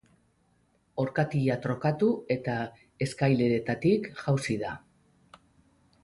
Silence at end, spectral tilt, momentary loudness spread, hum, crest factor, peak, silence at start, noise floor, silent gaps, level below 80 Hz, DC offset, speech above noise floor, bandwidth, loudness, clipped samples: 1.25 s; -7 dB/octave; 9 LU; none; 18 dB; -12 dBFS; 0.95 s; -68 dBFS; none; -62 dBFS; under 0.1%; 41 dB; 11.5 kHz; -29 LUFS; under 0.1%